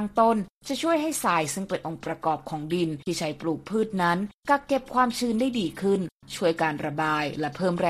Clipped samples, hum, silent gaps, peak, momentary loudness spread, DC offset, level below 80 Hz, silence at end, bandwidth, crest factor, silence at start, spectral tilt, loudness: under 0.1%; none; 0.50-0.61 s, 4.34-4.40 s, 6.12-6.20 s; -8 dBFS; 7 LU; under 0.1%; -58 dBFS; 0 s; 14.5 kHz; 18 dB; 0 s; -5 dB/octave; -26 LUFS